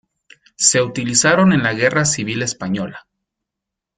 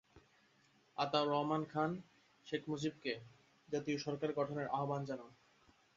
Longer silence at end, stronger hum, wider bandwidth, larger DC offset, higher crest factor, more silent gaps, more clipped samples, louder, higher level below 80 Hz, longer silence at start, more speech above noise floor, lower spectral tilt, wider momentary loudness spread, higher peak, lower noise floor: first, 1 s vs 0.65 s; neither; first, 9.6 kHz vs 7.6 kHz; neither; about the same, 18 dB vs 22 dB; neither; neither; first, -16 LUFS vs -40 LUFS; first, -54 dBFS vs -78 dBFS; first, 0.6 s vs 0.15 s; first, 67 dB vs 33 dB; about the same, -3.5 dB/octave vs -4.5 dB/octave; about the same, 10 LU vs 12 LU; first, 0 dBFS vs -18 dBFS; first, -83 dBFS vs -72 dBFS